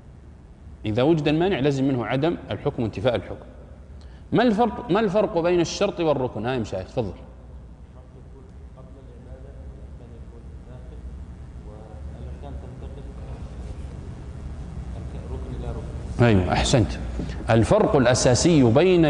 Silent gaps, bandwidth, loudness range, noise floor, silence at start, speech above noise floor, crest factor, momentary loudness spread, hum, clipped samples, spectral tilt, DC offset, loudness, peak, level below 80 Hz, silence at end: none; 10.5 kHz; 20 LU; -45 dBFS; 0.05 s; 24 dB; 18 dB; 25 LU; none; under 0.1%; -6 dB/octave; under 0.1%; -22 LUFS; -6 dBFS; -38 dBFS; 0 s